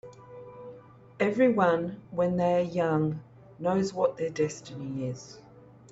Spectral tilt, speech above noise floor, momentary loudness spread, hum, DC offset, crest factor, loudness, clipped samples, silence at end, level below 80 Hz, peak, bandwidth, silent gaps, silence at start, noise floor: -7 dB/octave; 23 dB; 22 LU; none; under 0.1%; 18 dB; -28 LUFS; under 0.1%; 0.5 s; -64 dBFS; -12 dBFS; 8 kHz; none; 0.05 s; -50 dBFS